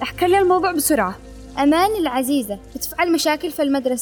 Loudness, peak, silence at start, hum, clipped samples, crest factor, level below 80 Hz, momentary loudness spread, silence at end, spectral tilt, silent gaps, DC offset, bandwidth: -19 LUFS; -6 dBFS; 0 s; none; under 0.1%; 14 dB; -44 dBFS; 11 LU; 0 s; -3.5 dB/octave; none; under 0.1%; over 20 kHz